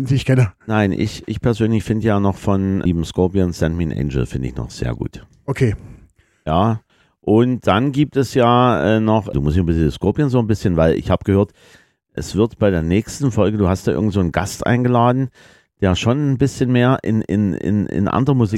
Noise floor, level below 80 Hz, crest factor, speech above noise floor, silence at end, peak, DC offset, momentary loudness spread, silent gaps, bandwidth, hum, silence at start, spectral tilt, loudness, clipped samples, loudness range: -50 dBFS; -36 dBFS; 16 dB; 34 dB; 0 s; -2 dBFS; under 0.1%; 9 LU; none; 13 kHz; none; 0 s; -7 dB/octave; -18 LUFS; under 0.1%; 5 LU